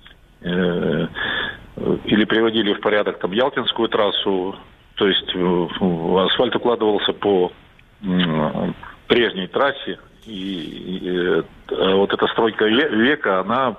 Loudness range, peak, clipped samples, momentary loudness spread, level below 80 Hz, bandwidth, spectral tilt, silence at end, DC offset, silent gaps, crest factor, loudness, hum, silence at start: 3 LU; 0 dBFS; under 0.1%; 11 LU; -50 dBFS; 5 kHz; -7.5 dB/octave; 0 s; under 0.1%; none; 18 dB; -19 LUFS; none; 0.4 s